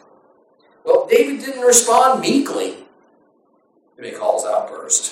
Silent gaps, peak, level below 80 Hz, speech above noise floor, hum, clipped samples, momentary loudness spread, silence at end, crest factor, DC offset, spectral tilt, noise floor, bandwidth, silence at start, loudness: none; 0 dBFS; -66 dBFS; 43 dB; none; under 0.1%; 15 LU; 0 s; 18 dB; under 0.1%; -2 dB/octave; -59 dBFS; 16.5 kHz; 0.85 s; -16 LUFS